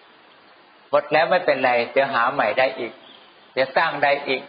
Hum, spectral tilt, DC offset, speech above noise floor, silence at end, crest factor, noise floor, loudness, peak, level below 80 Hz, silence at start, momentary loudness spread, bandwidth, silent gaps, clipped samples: none; -1 dB/octave; under 0.1%; 31 dB; 0 s; 18 dB; -51 dBFS; -20 LUFS; -4 dBFS; -72 dBFS; 0.9 s; 6 LU; 5.2 kHz; none; under 0.1%